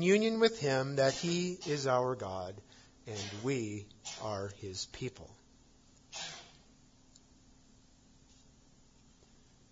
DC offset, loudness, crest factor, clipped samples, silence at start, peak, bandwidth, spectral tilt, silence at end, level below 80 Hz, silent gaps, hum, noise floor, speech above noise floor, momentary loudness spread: under 0.1%; -35 LUFS; 22 dB; under 0.1%; 0 s; -14 dBFS; 7.4 kHz; -4.5 dB/octave; 3.25 s; -68 dBFS; none; none; -63 dBFS; 29 dB; 17 LU